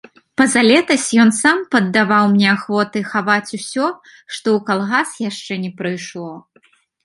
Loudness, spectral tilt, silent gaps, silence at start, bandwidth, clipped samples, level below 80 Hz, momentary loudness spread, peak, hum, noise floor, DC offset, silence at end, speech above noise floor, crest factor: -16 LUFS; -4 dB/octave; none; 0.4 s; 11.5 kHz; under 0.1%; -62 dBFS; 14 LU; 0 dBFS; none; -56 dBFS; under 0.1%; 0.65 s; 39 dB; 16 dB